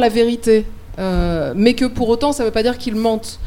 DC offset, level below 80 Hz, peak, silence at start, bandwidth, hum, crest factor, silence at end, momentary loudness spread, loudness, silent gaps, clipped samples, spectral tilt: under 0.1%; -30 dBFS; 0 dBFS; 0 s; 16.5 kHz; none; 16 dB; 0 s; 5 LU; -17 LUFS; none; under 0.1%; -5.5 dB/octave